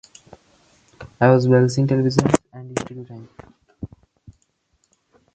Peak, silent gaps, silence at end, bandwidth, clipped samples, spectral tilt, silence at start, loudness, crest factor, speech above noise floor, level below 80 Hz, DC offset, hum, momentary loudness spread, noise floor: 0 dBFS; none; 1.5 s; 9 kHz; under 0.1%; -7 dB/octave; 1 s; -18 LUFS; 22 dB; 50 dB; -52 dBFS; under 0.1%; none; 23 LU; -67 dBFS